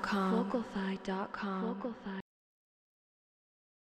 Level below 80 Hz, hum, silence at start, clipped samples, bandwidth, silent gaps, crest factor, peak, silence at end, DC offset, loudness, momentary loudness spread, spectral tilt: -68 dBFS; none; 0 s; under 0.1%; 9 kHz; none; 18 dB; -20 dBFS; 1.7 s; under 0.1%; -37 LUFS; 12 LU; -7 dB/octave